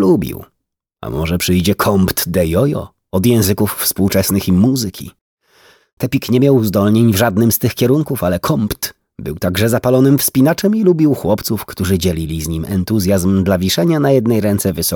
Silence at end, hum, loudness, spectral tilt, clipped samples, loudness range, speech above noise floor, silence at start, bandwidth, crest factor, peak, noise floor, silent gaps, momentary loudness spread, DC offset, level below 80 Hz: 0 s; none; -14 LUFS; -5.5 dB/octave; under 0.1%; 2 LU; 60 dB; 0 s; over 20 kHz; 14 dB; 0 dBFS; -74 dBFS; 5.21-5.37 s, 5.93-5.97 s; 10 LU; under 0.1%; -38 dBFS